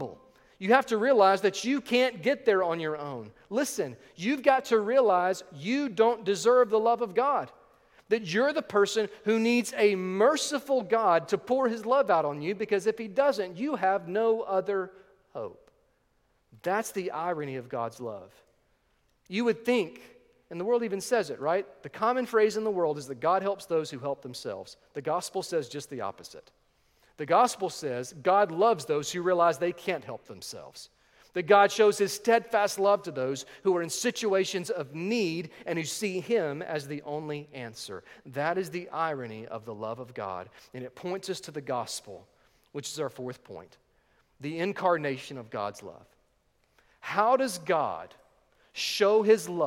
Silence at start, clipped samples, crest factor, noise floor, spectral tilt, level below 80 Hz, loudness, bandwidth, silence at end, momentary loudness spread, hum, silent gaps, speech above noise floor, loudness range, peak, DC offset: 0 s; under 0.1%; 24 dB; -70 dBFS; -4 dB/octave; -74 dBFS; -28 LUFS; 16.5 kHz; 0 s; 17 LU; none; none; 42 dB; 9 LU; -6 dBFS; under 0.1%